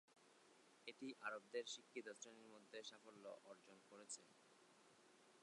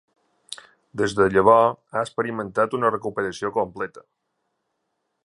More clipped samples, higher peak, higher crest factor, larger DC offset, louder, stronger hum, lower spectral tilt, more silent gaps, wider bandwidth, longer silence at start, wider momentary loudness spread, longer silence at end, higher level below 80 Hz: neither; second, -36 dBFS vs -2 dBFS; about the same, 24 dB vs 22 dB; neither; second, -56 LUFS vs -22 LUFS; neither; second, -1.5 dB/octave vs -5.5 dB/octave; neither; about the same, 11 kHz vs 11.5 kHz; second, 0.1 s vs 0.5 s; second, 14 LU vs 22 LU; second, 0 s vs 1.25 s; second, under -90 dBFS vs -56 dBFS